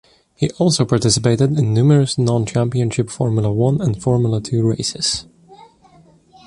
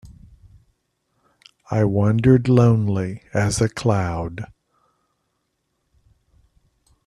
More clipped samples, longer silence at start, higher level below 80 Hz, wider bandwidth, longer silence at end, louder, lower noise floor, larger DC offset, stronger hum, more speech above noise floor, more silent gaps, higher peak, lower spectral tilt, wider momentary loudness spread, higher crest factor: neither; first, 0.4 s vs 0.05 s; about the same, -46 dBFS vs -46 dBFS; about the same, 11.5 kHz vs 12 kHz; second, 0.9 s vs 2.6 s; about the same, -17 LUFS vs -19 LUFS; second, -49 dBFS vs -73 dBFS; neither; neither; second, 33 dB vs 55 dB; neither; about the same, 0 dBFS vs -2 dBFS; about the same, -6 dB/octave vs -7 dB/octave; second, 6 LU vs 13 LU; about the same, 16 dB vs 20 dB